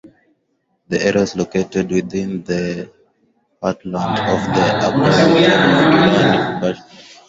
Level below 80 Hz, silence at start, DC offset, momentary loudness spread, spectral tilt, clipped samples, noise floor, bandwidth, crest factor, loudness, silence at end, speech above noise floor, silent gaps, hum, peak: -48 dBFS; 0.05 s; under 0.1%; 12 LU; -5.5 dB/octave; under 0.1%; -67 dBFS; 8 kHz; 16 dB; -16 LUFS; 0.25 s; 51 dB; none; none; -2 dBFS